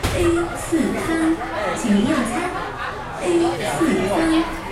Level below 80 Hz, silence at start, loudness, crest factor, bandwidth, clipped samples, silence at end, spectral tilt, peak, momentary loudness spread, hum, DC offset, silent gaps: -36 dBFS; 0 s; -21 LUFS; 14 dB; 15 kHz; under 0.1%; 0 s; -5 dB/octave; -6 dBFS; 7 LU; none; under 0.1%; none